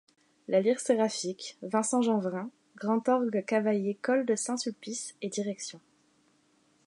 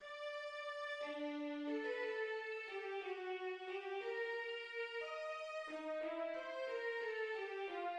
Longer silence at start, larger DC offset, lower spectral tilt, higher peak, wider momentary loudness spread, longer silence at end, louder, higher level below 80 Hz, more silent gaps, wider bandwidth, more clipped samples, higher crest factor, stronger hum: first, 0.5 s vs 0 s; neither; first, -4.5 dB/octave vs -2.5 dB/octave; first, -12 dBFS vs -32 dBFS; first, 11 LU vs 4 LU; first, 1.1 s vs 0 s; first, -30 LUFS vs -44 LUFS; first, -84 dBFS vs under -90 dBFS; neither; about the same, 11.5 kHz vs 10.5 kHz; neither; first, 18 dB vs 12 dB; neither